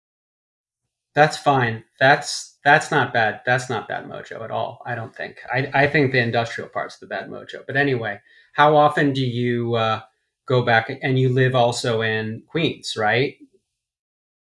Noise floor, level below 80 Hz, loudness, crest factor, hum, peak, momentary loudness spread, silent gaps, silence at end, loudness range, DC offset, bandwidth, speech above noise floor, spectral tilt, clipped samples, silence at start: -82 dBFS; -62 dBFS; -20 LUFS; 20 dB; none; -2 dBFS; 14 LU; none; 1.25 s; 4 LU; under 0.1%; 12 kHz; 62 dB; -5.5 dB/octave; under 0.1%; 1.15 s